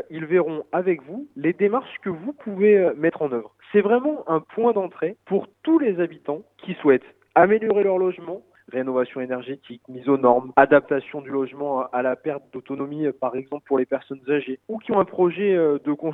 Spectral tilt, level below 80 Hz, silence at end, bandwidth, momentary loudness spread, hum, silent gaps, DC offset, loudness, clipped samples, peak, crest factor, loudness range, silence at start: -10 dB/octave; -70 dBFS; 0 s; 3.9 kHz; 14 LU; none; none; under 0.1%; -22 LUFS; under 0.1%; 0 dBFS; 22 dB; 4 LU; 0.1 s